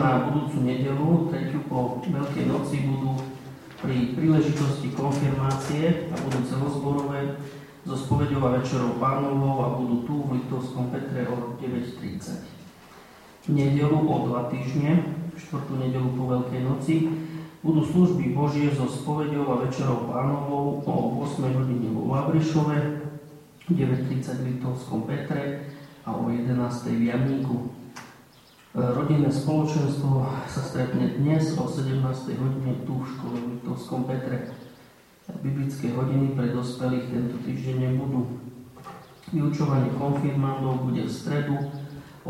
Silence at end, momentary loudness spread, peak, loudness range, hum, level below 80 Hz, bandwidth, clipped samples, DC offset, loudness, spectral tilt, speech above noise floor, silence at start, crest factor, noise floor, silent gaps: 0 s; 11 LU; -8 dBFS; 4 LU; none; -56 dBFS; 13.5 kHz; under 0.1%; under 0.1%; -26 LUFS; -8 dB/octave; 29 dB; 0 s; 18 dB; -53 dBFS; none